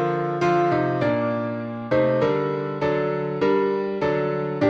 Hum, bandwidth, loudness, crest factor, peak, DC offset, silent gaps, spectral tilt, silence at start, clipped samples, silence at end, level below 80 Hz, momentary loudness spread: none; 7.6 kHz; -23 LUFS; 14 dB; -8 dBFS; under 0.1%; none; -8 dB/octave; 0 s; under 0.1%; 0 s; -56 dBFS; 5 LU